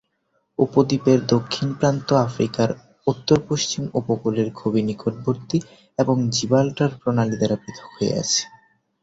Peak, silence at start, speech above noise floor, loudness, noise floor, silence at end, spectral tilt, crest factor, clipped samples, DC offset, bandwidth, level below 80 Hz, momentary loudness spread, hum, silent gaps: -2 dBFS; 0.6 s; 49 dB; -22 LUFS; -70 dBFS; 0.55 s; -5.5 dB/octave; 18 dB; under 0.1%; under 0.1%; 8 kHz; -54 dBFS; 7 LU; none; none